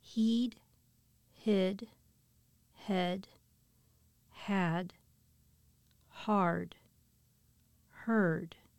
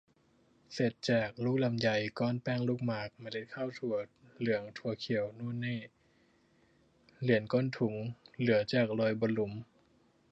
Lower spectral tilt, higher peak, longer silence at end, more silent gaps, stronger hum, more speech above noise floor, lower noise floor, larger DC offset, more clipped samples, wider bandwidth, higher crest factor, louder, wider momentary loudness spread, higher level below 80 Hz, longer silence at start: about the same, -7 dB/octave vs -7 dB/octave; second, -20 dBFS vs -14 dBFS; second, 0.3 s vs 0.7 s; neither; neither; about the same, 37 dB vs 36 dB; about the same, -70 dBFS vs -69 dBFS; neither; neither; first, 14 kHz vs 8 kHz; about the same, 18 dB vs 20 dB; about the same, -34 LUFS vs -34 LUFS; first, 16 LU vs 11 LU; about the same, -72 dBFS vs -70 dBFS; second, 0.05 s vs 0.7 s